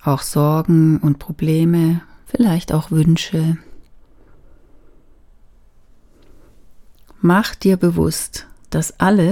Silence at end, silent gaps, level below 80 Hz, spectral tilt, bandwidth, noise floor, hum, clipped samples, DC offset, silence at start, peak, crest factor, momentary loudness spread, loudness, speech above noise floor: 0 s; none; -42 dBFS; -6.5 dB/octave; 16 kHz; -47 dBFS; none; under 0.1%; under 0.1%; 0.05 s; 0 dBFS; 18 dB; 10 LU; -17 LUFS; 32 dB